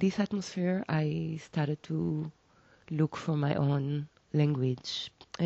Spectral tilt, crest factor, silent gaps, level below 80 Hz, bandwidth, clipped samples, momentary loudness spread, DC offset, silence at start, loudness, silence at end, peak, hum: -7 dB/octave; 18 dB; none; -66 dBFS; 7.8 kHz; under 0.1%; 8 LU; under 0.1%; 0 s; -32 LUFS; 0 s; -14 dBFS; none